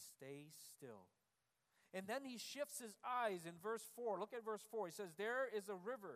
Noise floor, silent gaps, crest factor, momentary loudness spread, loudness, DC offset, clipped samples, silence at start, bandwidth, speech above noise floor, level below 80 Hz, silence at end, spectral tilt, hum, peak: -88 dBFS; none; 18 dB; 14 LU; -48 LUFS; under 0.1%; under 0.1%; 0 s; 15.5 kHz; 40 dB; under -90 dBFS; 0 s; -3.5 dB/octave; none; -30 dBFS